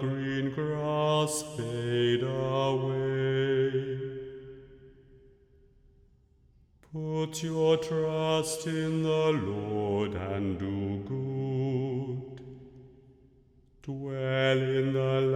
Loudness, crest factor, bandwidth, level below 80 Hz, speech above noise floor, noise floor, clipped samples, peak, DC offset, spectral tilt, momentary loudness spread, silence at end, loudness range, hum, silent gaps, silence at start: -30 LUFS; 16 dB; 14.5 kHz; -60 dBFS; 34 dB; -63 dBFS; under 0.1%; -14 dBFS; under 0.1%; -6 dB/octave; 13 LU; 0 s; 7 LU; none; none; 0 s